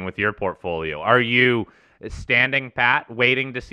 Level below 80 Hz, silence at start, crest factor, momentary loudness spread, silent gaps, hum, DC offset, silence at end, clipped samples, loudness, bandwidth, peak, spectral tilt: -46 dBFS; 0 s; 20 dB; 16 LU; none; none; under 0.1%; 0.05 s; under 0.1%; -19 LUFS; 10 kHz; -2 dBFS; -6 dB/octave